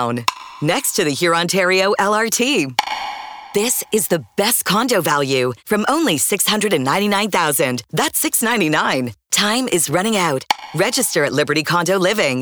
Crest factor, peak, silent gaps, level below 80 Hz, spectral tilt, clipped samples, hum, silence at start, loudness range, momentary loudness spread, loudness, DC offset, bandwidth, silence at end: 14 dB; -2 dBFS; none; -60 dBFS; -3 dB/octave; under 0.1%; none; 0 s; 1 LU; 5 LU; -17 LUFS; under 0.1%; over 20 kHz; 0 s